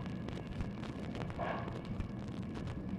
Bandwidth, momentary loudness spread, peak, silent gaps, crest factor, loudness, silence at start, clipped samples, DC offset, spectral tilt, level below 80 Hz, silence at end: 11 kHz; 4 LU; -24 dBFS; none; 16 dB; -42 LUFS; 0 s; under 0.1%; under 0.1%; -7.5 dB/octave; -50 dBFS; 0 s